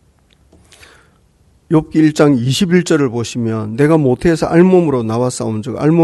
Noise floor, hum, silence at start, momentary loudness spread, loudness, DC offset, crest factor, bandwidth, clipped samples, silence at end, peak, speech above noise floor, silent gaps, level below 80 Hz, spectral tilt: -52 dBFS; none; 1.7 s; 9 LU; -13 LUFS; under 0.1%; 14 dB; 12 kHz; under 0.1%; 0 s; 0 dBFS; 40 dB; none; -44 dBFS; -6.5 dB/octave